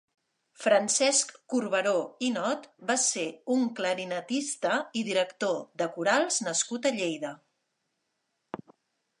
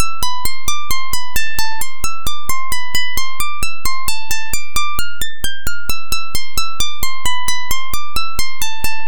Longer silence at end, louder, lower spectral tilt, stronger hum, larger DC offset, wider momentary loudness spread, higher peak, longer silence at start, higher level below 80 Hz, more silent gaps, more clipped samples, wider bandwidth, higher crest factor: first, 0.65 s vs 0 s; second, -28 LUFS vs -22 LUFS; about the same, -2 dB/octave vs -1 dB/octave; neither; second, under 0.1% vs 40%; first, 10 LU vs 3 LU; second, -10 dBFS vs 0 dBFS; first, 0.6 s vs 0 s; second, -82 dBFS vs -32 dBFS; neither; neither; second, 11.5 kHz vs 19 kHz; about the same, 20 dB vs 16 dB